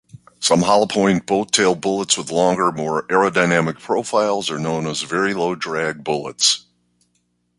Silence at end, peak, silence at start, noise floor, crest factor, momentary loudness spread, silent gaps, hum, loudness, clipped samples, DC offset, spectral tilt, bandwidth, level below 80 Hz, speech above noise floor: 1 s; 0 dBFS; 0.15 s; -67 dBFS; 18 dB; 7 LU; none; 60 Hz at -45 dBFS; -18 LUFS; under 0.1%; under 0.1%; -3.5 dB/octave; 11.5 kHz; -56 dBFS; 49 dB